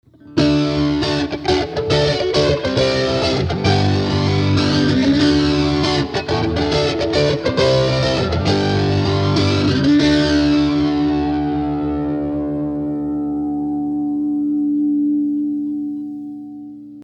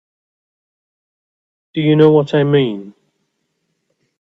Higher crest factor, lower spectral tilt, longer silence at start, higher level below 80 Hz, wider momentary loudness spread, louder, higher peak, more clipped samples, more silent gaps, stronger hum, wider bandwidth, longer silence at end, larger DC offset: about the same, 14 dB vs 18 dB; second, -6.5 dB/octave vs -9 dB/octave; second, 0.25 s vs 1.75 s; first, -36 dBFS vs -60 dBFS; second, 7 LU vs 14 LU; second, -17 LUFS vs -14 LUFS; about the same, -2 dBFS vs 0 dBFS; neither; neither; first, 60 Hz at -50 dBFS vs none; first, 9.4 kHz vs 7.2 kHz; second, 0 s vs 1.4 s; neither